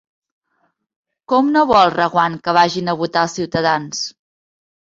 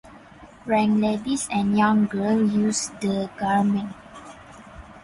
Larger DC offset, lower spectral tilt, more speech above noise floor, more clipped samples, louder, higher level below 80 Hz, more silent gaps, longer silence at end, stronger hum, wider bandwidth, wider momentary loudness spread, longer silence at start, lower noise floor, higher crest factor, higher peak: neither; about the same, -4.5 dB/octave vs -5 dB/octave; first, 51 dB vs 25 dB; neither; first, -16 LUFS vs -22 LUFS; about the same, -54 dBFS vs -54 dBFS; neither; first, 0.8 s vs 0.05 s; neither; second, 7.8 kHz vs 11.5 kHz; second, 8 LU vs 21 LU; first, 1.3 s vs 0.05 s; first, -66 dBFS vs -47 dBFS; about the same, 18 dB vs 16 dB; first, 0 dBFS vs -8 dBFS